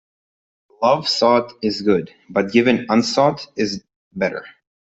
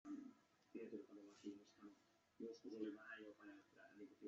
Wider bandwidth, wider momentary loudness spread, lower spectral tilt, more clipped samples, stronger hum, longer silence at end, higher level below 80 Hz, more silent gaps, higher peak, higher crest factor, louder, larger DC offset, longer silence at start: about the same, 8.2 kHz vs 7.6 kHz; second, 8 LU vs 13 LU; about the same, -5 dB/octave vs -4.5 dB/octave; neither; neither; first, 0.4 s vs 0 s; first, -60 dBFS vs under -90 dBFS; first, 3.96-4.11 s vs none; first, -2 dBFS vs -38 dBFS; about the same, 18 dB vs 20 dB; first, -19 LUFS vs -58 LUFS; neither; first, 0.8 s vs 0.05 s